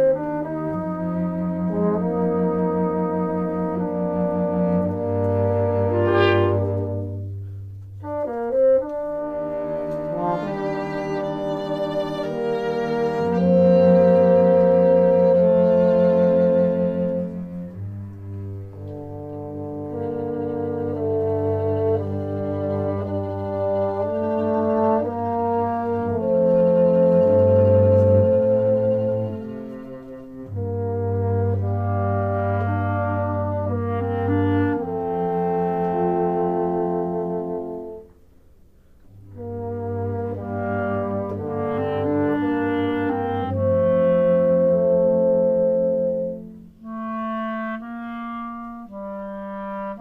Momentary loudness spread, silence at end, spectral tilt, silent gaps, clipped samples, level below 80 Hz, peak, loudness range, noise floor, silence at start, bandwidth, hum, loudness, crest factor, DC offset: 16 LU; 0 s; -10 dB/octave; none; under 0.1%; -54 dBFS; -6 dBFS; 11 LU; -50 dBFS; 0 s; 5 kHz; none; -21 LUFS; 16 dB; under 0.1%